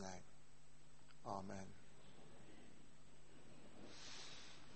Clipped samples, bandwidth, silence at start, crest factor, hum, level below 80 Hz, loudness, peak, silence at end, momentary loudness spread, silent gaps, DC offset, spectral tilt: under 0.1%; 8.4 kHz; 0 s; 24 dB; none; -74 dBFS; -57 LUFS; -32 dBFS; 0 s; 17 LU; none; 0.2%; -4 dB/octave